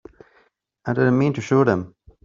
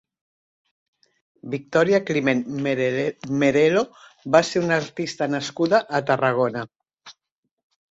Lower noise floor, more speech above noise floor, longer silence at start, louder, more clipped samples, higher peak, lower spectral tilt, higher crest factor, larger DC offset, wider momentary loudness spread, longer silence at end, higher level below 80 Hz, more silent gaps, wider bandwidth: second, -61 dBFS vs -80 dBFS; second, 43 dB vs 59 dB; second, 0.85 s vs 1.45 s; about the same, -20 LUFS vs -22 LUFS; neither; about the same, -4 dBFS vs -4 dBFS; first, -8 dB/octave vs -5.5 dB/octave; about the same, 18 dB vs 20 dB; neither; about the same, 14 LU vs 13 LU; second, 0.35 s vs 0.8 s; first, -56 dBFS vs -64 dBFS; neither; about the same, 7.6 kHz vs 8 kHz